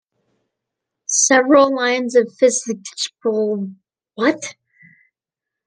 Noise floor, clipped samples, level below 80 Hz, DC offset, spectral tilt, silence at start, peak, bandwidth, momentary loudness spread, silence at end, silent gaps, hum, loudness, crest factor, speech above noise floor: -86 dBFS; under 0.1%; -70 dBFS; under 0.1%; -2.5 dB/octave; 1.1 s; -2 dBFS; 10.5 kHz; 15 LU; 1.15 s; none; none; -17 LUFS; 18 dB; 69 dB